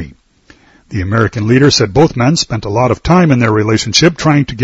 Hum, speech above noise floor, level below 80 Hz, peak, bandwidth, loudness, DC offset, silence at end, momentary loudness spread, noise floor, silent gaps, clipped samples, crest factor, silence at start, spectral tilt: none; 36 dB; -34 dBFS; 0 dBFS; 8 kHz; -11 LUFS; under 0.1%; 0 s; 7 LU; -46 dBFS; none; 0.3%; 12 dB; 0 s; -5 dB/octave